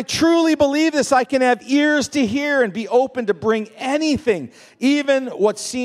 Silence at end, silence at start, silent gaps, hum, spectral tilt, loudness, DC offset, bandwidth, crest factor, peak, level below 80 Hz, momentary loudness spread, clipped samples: 0 s; 0 s; none; none; -4 dB/octave; -18 LUFS; under 0.1%; 13.5 kHz; 16 dB; -2 dBFS; -56 dBFS; 6 LU; under 0.1%